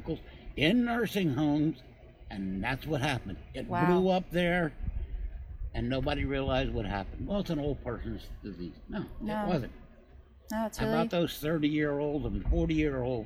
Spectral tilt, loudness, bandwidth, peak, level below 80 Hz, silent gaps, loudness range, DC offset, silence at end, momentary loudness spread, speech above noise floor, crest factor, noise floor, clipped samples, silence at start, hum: -6.5 dB/octave; -31 LUFS; 16 kHz; -12 dBFS; -42 dBFS; none; 5 LU; under 0.1%; 0 s; 14 LU; 24 dB; 18 dB; -54 dBFS; under 0.1%; 0 s; none